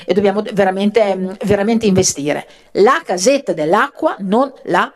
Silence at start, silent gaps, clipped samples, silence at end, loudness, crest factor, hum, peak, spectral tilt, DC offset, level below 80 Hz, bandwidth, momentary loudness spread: 0 s; none; under 0.1%; 0.05 s; -15 LUFS; 14 dB; none; 0 dBFS; -4.5 dB/octave; under 0.1%; -48 dBFS; 13 kHz; 7 LU